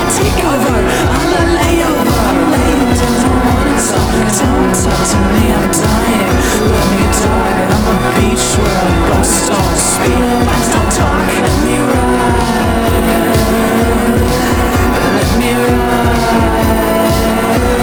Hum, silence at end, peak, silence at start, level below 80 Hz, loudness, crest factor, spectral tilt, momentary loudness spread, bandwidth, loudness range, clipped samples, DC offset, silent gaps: none; 0 s; 0 dBFS; 0 s; -20 dBFS; -11 LUFS; 10 dB; -5 dB/octave; 1 LU; over 20 kHz; 0 LU; under 0.1%; under 0.1%; none